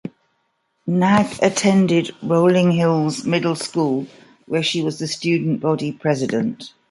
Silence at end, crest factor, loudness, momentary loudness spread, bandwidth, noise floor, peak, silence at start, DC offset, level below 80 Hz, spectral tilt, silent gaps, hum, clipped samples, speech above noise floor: 0.25 s; 16 dB; -19 LUFS; 9 LU; 11.5 kHz; -69 dBFS; -2 dBFS; 0.05 s; under 0.1%; -60 dBFS; -5.5 dB/octave; none; none; under 0.1%; 50 dB